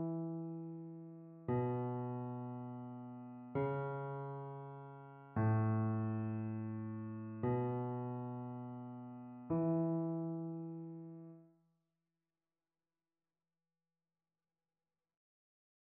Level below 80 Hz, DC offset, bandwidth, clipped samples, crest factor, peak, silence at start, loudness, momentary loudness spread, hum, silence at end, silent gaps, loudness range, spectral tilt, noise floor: -74 dBFS; under 0.1%; 3.5 kHz; under 0.1%; 16 dB; -26 dBFS; 0 s; -41 LUFS; 15 LU; none; 4.45 s; none; 7 LU; -10.5 dB/octave; under -90 dBFS